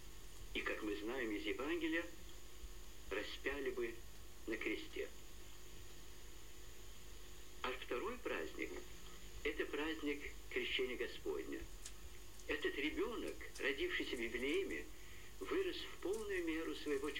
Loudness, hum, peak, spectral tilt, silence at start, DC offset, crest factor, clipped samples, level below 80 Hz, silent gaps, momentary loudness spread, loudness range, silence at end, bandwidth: -44 LUFS; 50 Hz at -60 dBFS; -26 dBFS; -3.5 dB/octave; 0 s; 0.3%; 18 dB; under 0.1%; -60 dBFS; none; 17 LU; 7 LU; 0 s; 16.5 kHz